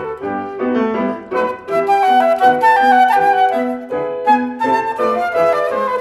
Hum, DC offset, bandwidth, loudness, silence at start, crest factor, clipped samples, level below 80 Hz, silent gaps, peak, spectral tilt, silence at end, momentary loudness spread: none; under 0.1%; 13 kHz; -15 LUFS; 0 s; 14 dB; under 0.1%; -56 dBFS; none; 0 dBFS; -5 dB/octave; 0 s; 10 LU